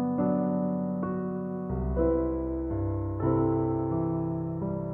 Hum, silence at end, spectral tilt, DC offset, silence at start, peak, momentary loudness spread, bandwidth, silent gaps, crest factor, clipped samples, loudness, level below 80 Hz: none; 0 s; -13.5 dB/octave; under 0.1%; 0 s; -14 dBFS; 6 LU; 2.6 kHz; none; 14 dB; under 0.1%; -29 LUFS; -40 dBFS